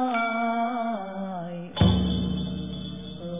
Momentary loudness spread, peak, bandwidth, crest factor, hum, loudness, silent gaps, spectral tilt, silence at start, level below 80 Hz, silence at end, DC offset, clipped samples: 12 LU; -8 dBFS; 3.8 kHz; 18 dB; none; -27 LUFS; none; -11 dB/octave; 0 s; -38 dBFS; 0 s; 0.3%; under 0.1%